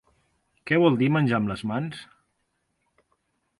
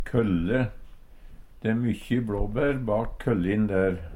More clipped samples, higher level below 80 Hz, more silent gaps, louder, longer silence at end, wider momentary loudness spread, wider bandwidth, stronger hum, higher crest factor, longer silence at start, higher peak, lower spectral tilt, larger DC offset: neither; second, -60 dBFS vs -38 dBFS; neither; first, -24 LUFS vs -27 LUFS; first, 1.55 s vs 0 s; first, 18 LU vs 4 LU; second, 11.5 kHz vs 15 kHz; neither; about the same, 20 dB vs 16 dB; first, 0.65 s vs 0 s; first, -6 dBFS vs -10 dBFS; about the same, -8 dB/octave vs -8.5 dB/octave; neither